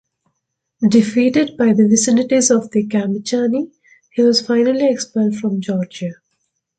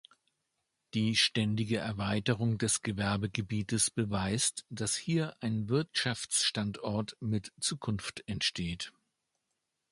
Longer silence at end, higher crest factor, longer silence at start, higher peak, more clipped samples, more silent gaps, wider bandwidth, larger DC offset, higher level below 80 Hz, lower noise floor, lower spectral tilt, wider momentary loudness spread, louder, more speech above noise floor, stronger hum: second, 0.65 s vs 1 s; second, 14 dB vs 20 dB; second, 0.8 s vs 0.95 s; first, -2 dBFS vs -14 dBFS; neither; neither; second, 9.2 kHz vs 11.5 kHz; neither; about the same, -60 dBFS vs -58 dBFS; second, -74 dBFS vs -84 dBFS; about the same, -4.5 dB/octave vs -3.5 dB/octave; about the same, 9 LU vs 8 LU; first, -16 LUFS vs -32 LUFS; first, 59 dB vs 51 dB; neither